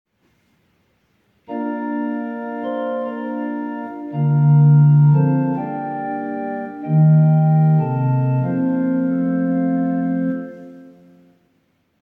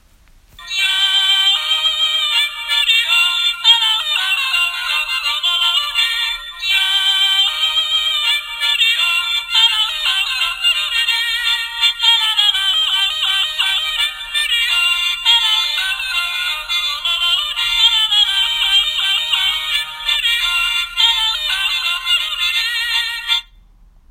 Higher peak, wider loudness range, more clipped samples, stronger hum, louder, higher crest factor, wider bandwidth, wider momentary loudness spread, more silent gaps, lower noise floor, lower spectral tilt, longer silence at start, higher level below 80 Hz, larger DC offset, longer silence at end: second, -6 dBFS vs 0 dBFS; first, 10 LU vs 2 LU; neither; neither; second, -18 LUFS vs -14 LUFS; about the same, 12 dB vs 16 dB; second, 3.3 kHz vs 16 kHz; first, 14 LU vs 6 LU; neither; first, -64 dBFS vs -48 dBFS; first, -12.5 dB/octave vs 4 dB/octave; first, 1.5 s vs 0.6 s; second, -64 dBFS vs -48 dBFS; neither; first, 1.2 s vs 0.7 s